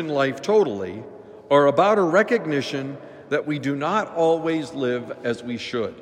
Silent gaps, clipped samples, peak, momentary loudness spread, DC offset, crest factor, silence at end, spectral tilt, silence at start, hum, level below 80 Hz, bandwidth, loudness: none; under 0.1%; -4 dBFS; 13 LU; under 0.1%; 18 dB; 0 s; -6 dB/octave; 0 s; none; -68 dBFS; 10.5 kHz; -22 LUFS